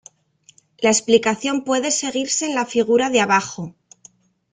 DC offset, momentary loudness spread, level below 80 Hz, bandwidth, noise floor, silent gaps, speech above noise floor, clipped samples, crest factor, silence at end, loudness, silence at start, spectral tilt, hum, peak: under 0.1%; 6 LU; -62 dBFS; 9.6 kHz; -56 dBFS; none; 37 dB; under 0.1%; 18 dB; 0.85 s; -18 LUFS; 0.8 s; -2.5 dB/octave; none; -2 dBFS